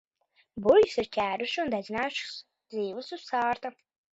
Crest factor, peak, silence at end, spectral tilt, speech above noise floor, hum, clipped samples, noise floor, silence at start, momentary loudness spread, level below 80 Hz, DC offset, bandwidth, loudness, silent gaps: 20 dB; -8 dBFS; 0.45 s; -4.5 dB/octave; 42 dB; none; under 0.1%; -70 dBFS; 0.55 s; 18 LU; -64 dBFS; under 0.1%; 8 kHz; -28 LUFS; none